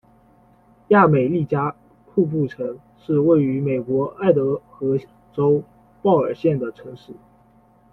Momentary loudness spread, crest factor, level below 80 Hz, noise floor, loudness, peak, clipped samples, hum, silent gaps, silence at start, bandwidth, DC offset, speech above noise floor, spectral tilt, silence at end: 14 LU; 18 dB; -58 dBFS; -54 dBFS; -20 LUFS; -2 dBFS; under 0.1%; none; none; 0.9 s; 4.5 kHz; under 0.1%; 35 dB; -10.5 dB/octave; 0.8 s